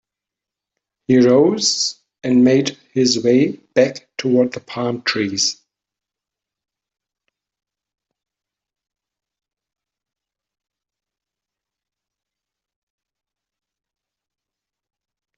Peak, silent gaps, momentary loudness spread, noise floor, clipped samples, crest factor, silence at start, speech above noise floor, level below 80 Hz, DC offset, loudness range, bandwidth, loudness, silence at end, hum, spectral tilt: -2 dBFS; none; 11 LU; -87 dBFS; under 0.1%; 18 dB; 1.1 s; 71 dB; -64 dBFS; under 0.1%; 9 LU; 8.2 kHz; -17 LUFS; 9.85 s; none; -4 dB/octave